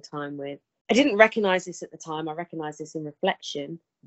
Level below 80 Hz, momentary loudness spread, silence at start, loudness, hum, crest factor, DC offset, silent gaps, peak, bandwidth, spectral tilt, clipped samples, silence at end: -68 dBFS; 19 LU; 0.05 s; -25 LUFS; none; 26 dB; under 0.1%; 0.81-0.85 s; 0 dBFS; 8.4 kHz; -4.5 dB/octave; under 0.1%; 0.3 s